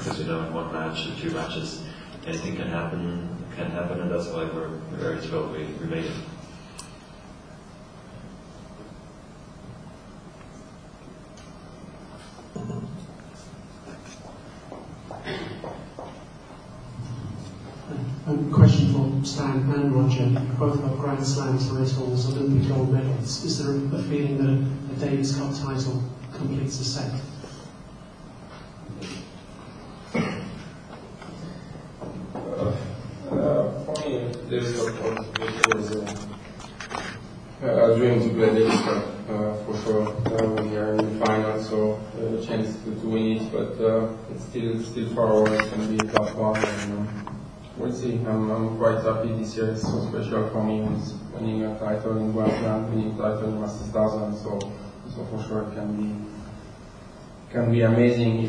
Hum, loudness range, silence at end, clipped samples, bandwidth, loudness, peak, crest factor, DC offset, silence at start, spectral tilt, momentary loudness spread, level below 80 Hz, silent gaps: none; 17 LU; 0 s; under 0.1%; 10.5 kHz; -25 LUFS; 0 dBFS; 26 dB; under 0.1%; 0 s; -6.5 dB/octave; 22 LU; -50 dBFS; none